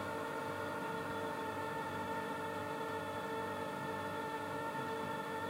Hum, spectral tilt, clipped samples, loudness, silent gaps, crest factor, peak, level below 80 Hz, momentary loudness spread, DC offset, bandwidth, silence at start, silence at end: none; -5 dB/octave; under 0.1%; -41 LUFS; none; 12 dB; -28 dBFS; -72 dBFS; 1 LU; under 0.1%; 16 kHz; 0 s; 0 s